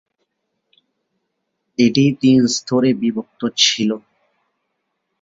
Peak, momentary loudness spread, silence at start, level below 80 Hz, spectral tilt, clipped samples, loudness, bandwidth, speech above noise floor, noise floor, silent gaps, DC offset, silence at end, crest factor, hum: 0 dBFS; 10 LU; 1.8 s; -60 dBFS; -4.5 dB/octave; under 0.1%; -16 LUFS; 7.8 kHz; 58 dB; -74 dBFS; none; under 0.1%; 1.25 s; 18 dB; none